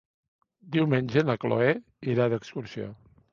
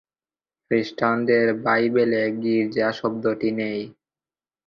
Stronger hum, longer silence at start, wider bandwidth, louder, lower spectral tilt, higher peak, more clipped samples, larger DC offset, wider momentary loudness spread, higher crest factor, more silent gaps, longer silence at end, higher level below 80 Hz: neither; about the same, 0.65 s vs 0.7 s; about the same, 7.2 kHz vs 6.8 kHz; second, -27 LUFS vs -22 LUFS; about the same, -8 dB/octave vs -7.5 dB/octave; about the same, -8 dBFS vs -6 dBFS; neither; neither; first, 13 LU vs 7 LU; about the same, 20 dB vs 18 dB; neither; second, 0.4 s vs 0.75 s; about the same, -64 dBFS vs -64 dBFS